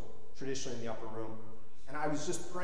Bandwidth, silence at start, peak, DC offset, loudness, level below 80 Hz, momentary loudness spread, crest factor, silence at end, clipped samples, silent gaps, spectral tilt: 11 kHz; 0 s; -20 dBFS; 3%; -40 LUFS; -62 dBFS; 18 LU; 18 dB; 0 s; under 0.1%; none; -4 dB/octave